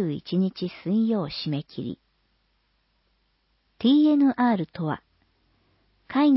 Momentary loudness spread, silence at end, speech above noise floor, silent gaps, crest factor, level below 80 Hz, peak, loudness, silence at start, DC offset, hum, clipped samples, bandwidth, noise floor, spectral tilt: 16 LU; 0 s; 47 dB; none; 14 dB; -64 dBFS; -10 dBFS; -25 LUFS; 0 s; under 0.1%; none; under 0.1%; 5.8 kHz; -70 dBFS; -11 dB/octave